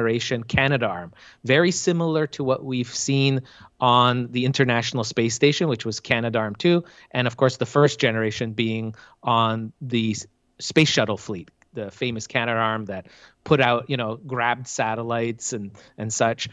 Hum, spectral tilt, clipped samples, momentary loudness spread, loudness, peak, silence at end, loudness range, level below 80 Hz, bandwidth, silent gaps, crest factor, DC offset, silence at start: none; -4.5 dB/octave; under 0.1%; 14 LU; -22 LUFS; -4 dBFS; 0 s; 3 LU; -56 dBFS; 9.4 kHz; none; 20 dB; under 0.1%; 0 s